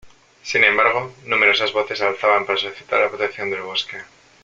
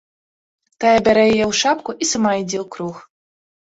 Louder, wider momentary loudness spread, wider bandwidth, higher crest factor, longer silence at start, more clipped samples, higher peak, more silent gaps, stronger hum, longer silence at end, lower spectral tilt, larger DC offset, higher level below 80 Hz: about the same, -18 LUFS vs -17 LUFS; second, 11 LU vs 14 LU; about the same, 7.8 kHz vs 8 kHz; about the same, 20 dB vs 16 dB; second, 0.05 s vs 0.8 s; neither; about the same, 0 dBFS vs -2 dBFS; neither; neither; second, 0.4 s vs 0.7 s; about the same, -2.5 dB/octave vs -3.5 dB/octave; neither; second, -62 dBFS vs -52 dBFS